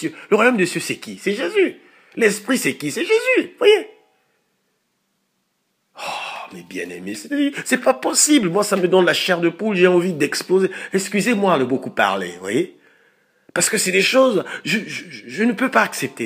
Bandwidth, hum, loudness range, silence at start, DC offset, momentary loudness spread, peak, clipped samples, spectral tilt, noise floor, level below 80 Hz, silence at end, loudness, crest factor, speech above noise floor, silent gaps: 15.5 kHz; none; 8 LU; 0 s; under 0.1%; 14 LU; 0 dBFS; under 0.1%; -3.5 dB/octave; -70 dBFS; -74 dBFS; 0 s; -18 LUFS; 20 dB; 52 dB; none